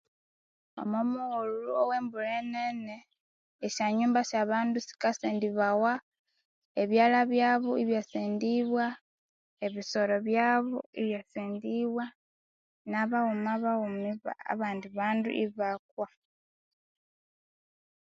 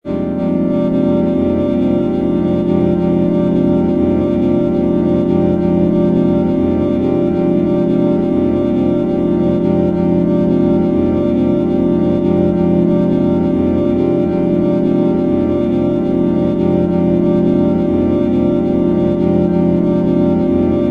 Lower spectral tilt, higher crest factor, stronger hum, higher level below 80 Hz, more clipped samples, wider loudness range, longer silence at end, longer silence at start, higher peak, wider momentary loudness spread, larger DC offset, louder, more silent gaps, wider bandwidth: second, -5 dB/octave vs -10.5 dB/octave; first, 18 dB vs 12 dB; neither; second, -80 dBFS vs -36 dBFS; neither; first, 5 LU vs 1 LU; first, 2.05 s vs 0 s; first, 0.75 s vs 0.05 s; second, -12 dBFS vs 0 dBFS; first, 12 LU vs 2 LU; neither; second, -30 LUFS vs -14 LUFS; first, 3.20-3.59 s, 6.02-6.12 s, 6.19-6.25 s, 6.45-6.75 s, 9.01-9.57 s, 10.86-10.93 s, 12.15-12.85 s, 15.79-15.97 s vs none; first, 7.6 kHz vs 5 kHz